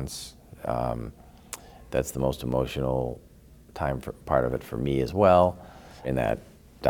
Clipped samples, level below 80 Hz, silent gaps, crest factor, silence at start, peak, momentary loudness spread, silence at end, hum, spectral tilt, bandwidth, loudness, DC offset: under 0.1%; -44 dBFS; none; 22 dB; 0 s; -6 dBFS; 20 LU; 0 s; none; -6.5 dB/octave; 19 kHz; -27 LUFS; under 0.1%